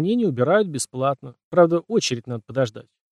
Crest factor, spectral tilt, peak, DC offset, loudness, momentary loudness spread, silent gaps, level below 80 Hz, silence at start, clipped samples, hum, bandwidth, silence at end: 18 dB; -5.5 dB/octave; -4 dBFS; under 0.1%; -22 LUFS; 10 LU; 1.44-1.51 s; -66 dBFS; 0 s; under 0.1%; none; 13 kHz; 0.3 s